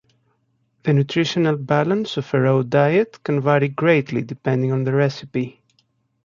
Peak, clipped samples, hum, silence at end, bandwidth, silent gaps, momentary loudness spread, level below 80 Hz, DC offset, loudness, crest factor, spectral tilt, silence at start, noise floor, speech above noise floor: -2 dBFS; under 0.1%; none; 0.75 s; 7.4 kHz; none; 9 LU; -62 dBFS; under 0.1%; -20 LUFS; 18 dB; -7.5 dB/octave; 0.85 s; -66 dBFS; 48 dB